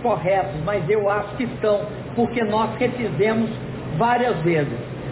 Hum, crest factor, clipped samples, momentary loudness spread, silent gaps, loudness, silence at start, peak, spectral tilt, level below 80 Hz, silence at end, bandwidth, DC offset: none; 12 dB; under 0.1%; 7 LU; none; -22 LUFS; 0 s; -8 dBFS; -11 dB/octave; -46 dBFS; 0 s; 4 kHz; under 0.1%